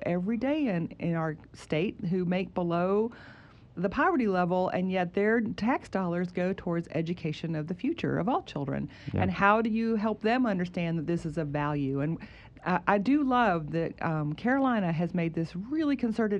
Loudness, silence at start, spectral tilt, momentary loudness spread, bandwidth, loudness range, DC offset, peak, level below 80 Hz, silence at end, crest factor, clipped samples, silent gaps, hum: -29 LUFS; 0 s; -8 dB/octave; 8 LU; 9 kHz; 3 LU; under 0.1%; -8 dBFS; -56 dBFS; 0 s; 20 dB; under 0.1%; none; none